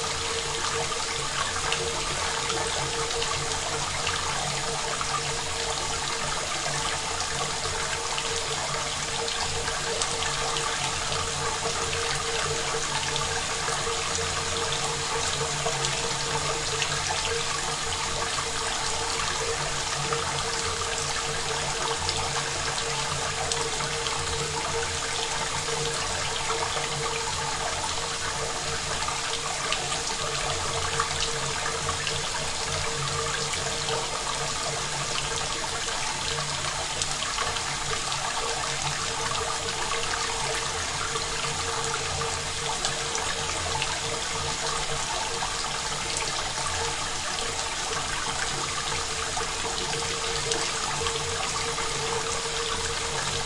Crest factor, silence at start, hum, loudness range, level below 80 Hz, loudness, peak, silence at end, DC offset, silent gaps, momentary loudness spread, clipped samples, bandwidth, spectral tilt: 20 dB; 0 s; none; 1 LU; -44 dBFS; -27 LUFS; -8 dBFS; 0 s; under 0.1%; none; 2 LU; under 0.1%; 11.5 kHz; -1.5 dB/octave